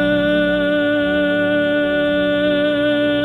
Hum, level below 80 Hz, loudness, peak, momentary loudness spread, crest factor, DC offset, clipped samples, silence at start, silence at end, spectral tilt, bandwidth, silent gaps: none; -42 dBFS; -17 LUFS; -6 dBFS; 1 LU; 10 dB; under 0.1%; under 0.1%; 0 s; 0 s; -7 dB/octave; 10 kHz; none